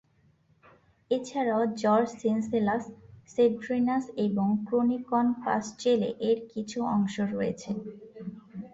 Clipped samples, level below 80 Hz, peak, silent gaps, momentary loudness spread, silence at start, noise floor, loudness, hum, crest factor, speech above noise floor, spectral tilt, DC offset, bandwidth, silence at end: under 0.1%; -66 dBFS; -12 dBFS; none; 11 LU; 1.1 s; -65 dBFS; -28 LUFS; none; 16 dB; 37 dB; -6.5 dB/octave; under 0.1%; 8 kHz; 0.05 s